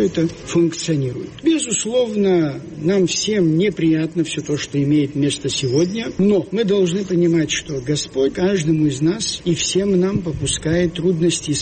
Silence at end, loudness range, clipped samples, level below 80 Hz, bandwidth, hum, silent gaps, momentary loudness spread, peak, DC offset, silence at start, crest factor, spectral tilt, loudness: 0 s; 1 LU; under 0.1%; -44 dBFS; 8.8 kHz; none; none; 5 LU; -6 dBFS; under 0.1%; 0 s; 12 dB; -5 dB/octave; -18 LUFS